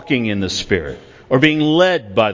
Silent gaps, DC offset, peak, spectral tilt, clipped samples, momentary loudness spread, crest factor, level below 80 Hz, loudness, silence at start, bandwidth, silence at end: none; under 0.1%; 0 dBFS; -5 dB/octave; under 0.1%; 8 LU; 16 dB; -42 dBFS; -16 LUFS; 0 s; 7.6 kHz; 0 s